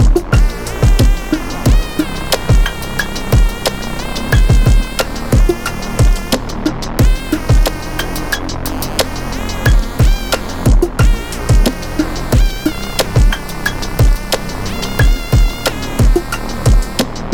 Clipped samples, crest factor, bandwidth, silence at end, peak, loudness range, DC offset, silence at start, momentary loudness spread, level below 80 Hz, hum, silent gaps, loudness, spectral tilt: under 0.1%; 12 dB; 18.5 kHz; 0 s; -2 dBFS; 2 LU; 1%; 0 s; 7 LU; -14 dBFS; none; none; -16 LUFS; -5 dB/octave